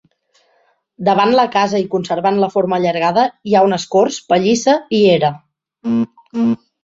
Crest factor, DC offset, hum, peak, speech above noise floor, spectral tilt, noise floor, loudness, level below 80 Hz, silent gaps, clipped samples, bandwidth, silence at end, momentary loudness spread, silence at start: 14 dB; under 0.1%; none; 0 dBFS; 45 dB; -5 dB/octave; -59 dBFS; -15 LUFS; -58 dBFS; none; under 0.1%; 8 kHz; 0.3 s; 7 LU; 1 s